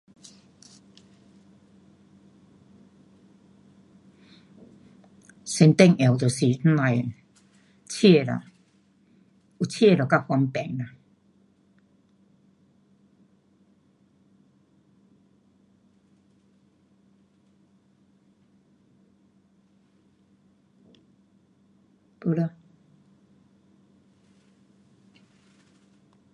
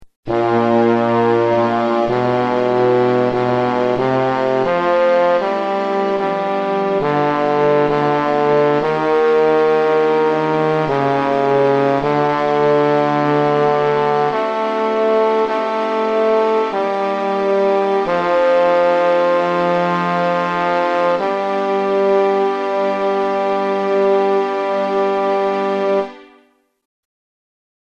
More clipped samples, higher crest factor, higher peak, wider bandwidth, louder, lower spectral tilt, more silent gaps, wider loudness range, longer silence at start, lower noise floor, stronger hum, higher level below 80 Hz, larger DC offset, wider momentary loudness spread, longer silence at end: neither; first, 28 dB vs 12 dB; about the same, -2 dBFS vs -4 dBFS; first, 11.5 kHz vs 8.4 kHz; second, -22 LUFS vs -16 LUFS; about the same, -6.5 dB/octave vs -7 dB/octave; second, none vs 0.16-0.23 s; first, 14 LU vs 2 LU; first, 5.45 s vs 0 s; first, -62 dBFS vs -55 dBFS; neither; second, -70 dBFS vs -52 dBFS; neither; first, 17 LU vs 4 LU; first, 3.85 s vs 1.6 s